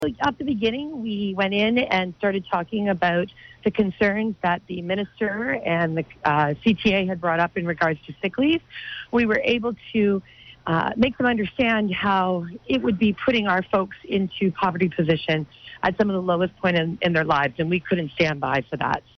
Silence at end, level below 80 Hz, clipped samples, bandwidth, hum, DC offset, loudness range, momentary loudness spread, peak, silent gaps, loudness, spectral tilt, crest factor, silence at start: 0.2 s; -52 dBFS; under 0.1%; 6.4 kHz; none; under 0.1%; 2 LU; 6 LU; -8 dBFS; none; -23 LUFS; -7 dB/octave; 14 dB; 0 s